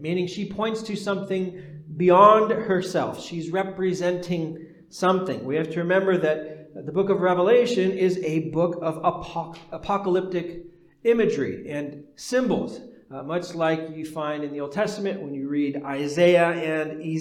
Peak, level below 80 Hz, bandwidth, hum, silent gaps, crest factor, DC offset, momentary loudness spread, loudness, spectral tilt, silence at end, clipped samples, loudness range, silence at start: -2 dBFS; -60 dBFS; 13.5 kHz; none; none; 22 dB; under 0.1%; 15 LU; -24 LUFS; -6 dB/octave; 0 s; under 0.1%; 6 LU; 0 s